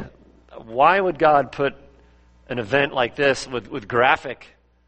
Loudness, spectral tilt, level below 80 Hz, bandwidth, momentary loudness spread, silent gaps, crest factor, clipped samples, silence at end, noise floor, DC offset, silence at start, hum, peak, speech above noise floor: -20 LUFS; -5 dB/octave; -52 dBFS; 8.4 kHz; 14 LU; none; 20 dB; under 0.1%; 0.55 s; -53 dBFS; under 0.1%; 0 s; none; 0 dBFS; 33 dB